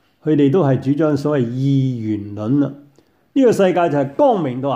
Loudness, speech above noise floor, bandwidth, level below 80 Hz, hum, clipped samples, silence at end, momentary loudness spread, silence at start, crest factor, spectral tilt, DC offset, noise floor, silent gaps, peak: -17 LUFS; 38 dB; 11.5 kHz; -60 dBFS; none; under 0.1%; 0 s; 9 LU; 0.25 s; 14 dB; -8.5 dB/octave; under 0.1%; -54 dBFS; none; -4 dBFS